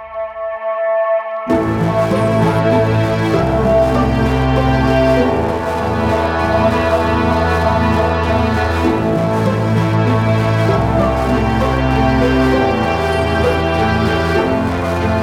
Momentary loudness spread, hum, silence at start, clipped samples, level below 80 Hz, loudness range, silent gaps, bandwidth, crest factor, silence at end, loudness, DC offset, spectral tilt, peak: 4 LU; none; 0 s; under 0.1%; -26 dBFS; 1 LU; none; 15 kHz; 12 dB; 0 s; -15 LUFS; under 0.1%; -7.5 dB/octave; -2 dBFS